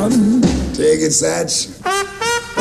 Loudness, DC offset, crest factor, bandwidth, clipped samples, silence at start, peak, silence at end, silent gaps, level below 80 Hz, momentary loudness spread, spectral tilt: -16 LUFS; under 0.1%; 14 dB; 14.5 kHz; under 0.1%; 0 s; -2 dBFS; 0 s; none; -32 dBFS; 6 LU; -4 dB/octave